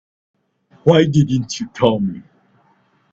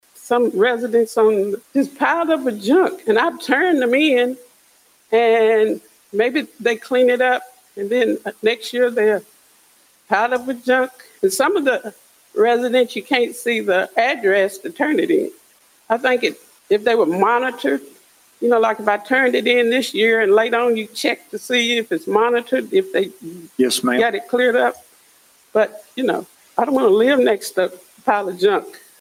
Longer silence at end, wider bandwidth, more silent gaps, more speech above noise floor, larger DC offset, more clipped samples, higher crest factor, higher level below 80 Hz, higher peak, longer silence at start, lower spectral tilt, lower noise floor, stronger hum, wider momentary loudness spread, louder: first, 0.9 s vs 0.25 s; second, 7.8 kHz vs 16.5 kHz; neither; first, 43 dB vs 38 dB; neither; neither; about the same, 18 dB vs 18 dB; first, -52 dBFS vs -68 dBFS; about the same, 0 dBFS vs 0 dBFS; first, 0.85 s vs 0.25 s; first, -6.5 dB/octave vs -3.5 dB/octave; about the same, -58 dBFS vs -55 dBFS; neither; first, 12 LU vs 8 LU; about the same, -17 LUFS vs -18 LUFS